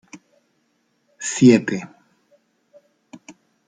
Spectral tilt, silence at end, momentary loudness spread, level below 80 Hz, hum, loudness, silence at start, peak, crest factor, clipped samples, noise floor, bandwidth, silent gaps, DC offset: -5.5 dB/octave; 0.35 s; 17 LU; -64 dBFS; none; -17 LUFS; 0.15 s; -2 dBFS; 20 dB; under 0.1%; -67 dBFS; 9.4 kHz; none; under 0.1%